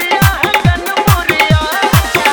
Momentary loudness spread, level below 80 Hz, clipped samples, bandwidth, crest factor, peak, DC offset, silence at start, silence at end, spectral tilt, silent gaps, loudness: 2 LU; -24 dBFS; 0.2%; over 20 kHz; 12 dB; 0 dBFS; under 0.1%; 0 s; 0 s; -4.5 dB/octave; none; -11 LUFS